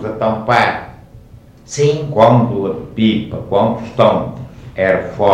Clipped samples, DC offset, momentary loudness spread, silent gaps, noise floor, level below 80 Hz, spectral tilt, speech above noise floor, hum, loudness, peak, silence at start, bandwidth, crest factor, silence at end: under 0.1%; under 0.1%; 16 LU; none; -40 dBFS; -44 dBFS; -6.5 dB/octave; 27 dB; none; -15 LUFS; 0 dBFS; 0 s; 10.5 kHz; 14 dB; 0 s